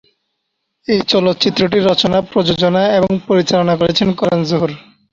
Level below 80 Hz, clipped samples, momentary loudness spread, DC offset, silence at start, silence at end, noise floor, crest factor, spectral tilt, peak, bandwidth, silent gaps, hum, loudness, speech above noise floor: -46 dBFS; under 0.1%; 5 LU; under 0.1%; 0.9 s; 0.35 s; -72 dBFS; 14 dB; -6 dB/octave; 0 dBFS; 7.6 kHz; none; none; -14 LUFS; 58 dB